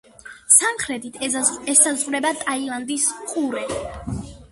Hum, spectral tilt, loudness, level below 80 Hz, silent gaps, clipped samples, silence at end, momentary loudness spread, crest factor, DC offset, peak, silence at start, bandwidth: none; -2 dB/octave; -19 LUFS; -48 dBFS; none; under 0.1%; 0.05 s; 16 LU; 22 dB; under 0.1%; 0 dBFS; 0.25 s; 12 kHz